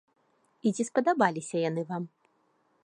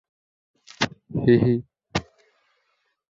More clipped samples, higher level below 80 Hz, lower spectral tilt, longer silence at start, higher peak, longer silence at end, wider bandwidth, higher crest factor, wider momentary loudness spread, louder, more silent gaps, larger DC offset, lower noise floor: neither; second, -82 dBFS vs -52 dBFS; about the same, -5.5 dB/octave vs -6.5 dB/octave; second, 0.65 s vs 0.8 s; about the same, -8 dBFS vs -6 dBFS; second, 0.75 s vs 1.15 s; first, 11.5 kHz vs 7.8 kHz; about the same, 22 dB vs 20 dB; about the same, 11 LU vs 12 LU; second, -29 LUFS vs -23 LUFS; neither; neither; about the same, -70 dBFS vs -72 dBFS